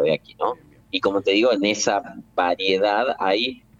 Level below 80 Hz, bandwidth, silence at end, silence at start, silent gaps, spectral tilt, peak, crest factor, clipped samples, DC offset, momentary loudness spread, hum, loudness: -60 dBFS; 7.8 kHz; 0.25 s; 0 s; none; -3 dB/octave; -6 dBFS; 16 dB; under 0.1%; under 0.1%; 8 LU; none; -21 LUFS